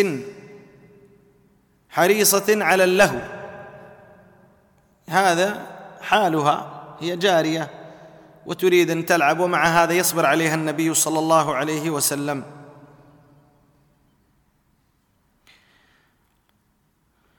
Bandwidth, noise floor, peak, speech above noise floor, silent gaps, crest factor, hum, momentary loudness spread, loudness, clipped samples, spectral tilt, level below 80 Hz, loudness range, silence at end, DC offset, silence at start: 19 kHz; -65 dBFS; -4 dBFS; 46 dB; none; 20 dB; none; 19 LU; -19 LUFS; under 0.1%; -3.5 dB/octave; -60 dBFS; 6 LU; 4.7 s; under 0.1%; 0 s